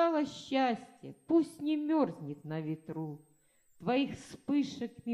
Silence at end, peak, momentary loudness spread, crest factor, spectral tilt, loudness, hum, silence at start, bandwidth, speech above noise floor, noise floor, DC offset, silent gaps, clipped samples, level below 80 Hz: 0 s; -18 dBFS; 13 LU; 16 dB; -6.5 dB/octave; -34 LUFS; none; 0 s; 12 kHz; 33 dB; -67 dBFS; under 0.1%; none; under 0.1%; -74 dBFS